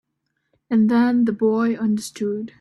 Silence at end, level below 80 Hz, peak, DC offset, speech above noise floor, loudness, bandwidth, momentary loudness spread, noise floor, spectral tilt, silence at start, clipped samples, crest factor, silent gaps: 0.1 s; -64 dBFS; -8 dBFS; under 0.1%; 56 dB; -20 LUFS; 12 kHz; 9 LU; -75 dBFS; -6.5 dB/octave; 0.7 s; under 0.1%; 12 dB; none